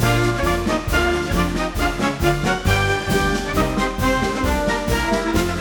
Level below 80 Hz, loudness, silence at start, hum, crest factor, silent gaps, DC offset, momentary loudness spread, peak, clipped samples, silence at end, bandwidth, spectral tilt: -28 dBFS; -20 LUFS; 0 s; none; 16 dB; none; under 0.1%; 2 LU; -2 dBFS; under 0.1%; 0 s; 19.5 kHz; -5 dB/octave